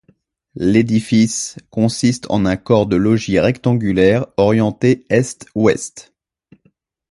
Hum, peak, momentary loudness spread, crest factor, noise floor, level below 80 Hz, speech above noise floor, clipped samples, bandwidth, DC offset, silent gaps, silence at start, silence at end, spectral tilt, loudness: none; 0 dBFS; 6 LU; 16 dB; -60 dBFS; -44 dBFS; 44 dB; under 0.1%; 11.5 kHz; under 0.1%; none; 0.55 s; 1.1 s; -6 dB/octave; -16 LUFS